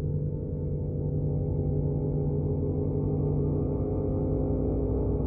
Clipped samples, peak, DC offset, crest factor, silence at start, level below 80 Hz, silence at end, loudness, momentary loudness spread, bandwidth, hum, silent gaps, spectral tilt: under 0.1%; -16 dBFS; under 0.1%; 12 dB; 0 s; -36 dBFS; 0 s; -29 LUFS; 3 LU; 1.6 kHz; none; none; -15.5 dB/octave